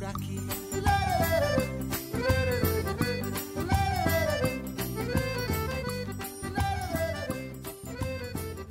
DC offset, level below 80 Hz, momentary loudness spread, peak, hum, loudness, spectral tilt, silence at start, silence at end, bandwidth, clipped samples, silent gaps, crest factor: under 0.1%; -42 dBFS; 10 LU; -14 dBFS; none; -30 LUFS; -5 dB/octave; 0 s; 0 s; 16.5 kHz; under 0.1%; none; 16 dB